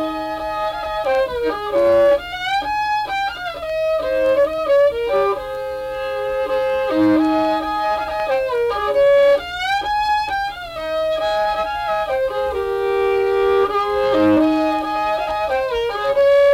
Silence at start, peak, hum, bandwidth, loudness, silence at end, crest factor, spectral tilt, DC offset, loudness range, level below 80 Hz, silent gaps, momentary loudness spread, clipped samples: 0 s; -6 dBFS; none; 15.5 kHz; -18 LUFS; 0 s; 12 dB; -5 dB/octave; under 0.1%; 2 LU; -44 dBFS; none; 9 LU; under 0.1%